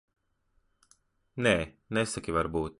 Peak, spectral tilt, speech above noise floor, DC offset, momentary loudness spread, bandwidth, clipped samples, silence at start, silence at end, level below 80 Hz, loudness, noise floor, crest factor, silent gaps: -10 dBFS; -4.5 dB/octave; 43 dB; under 0.1%; 6 LU; 11.5 kHz; under 0.1%; 1.35 s; 0.1 s; -50 dBFS; -30 LUFS; -72 dBFS; 22 dB; none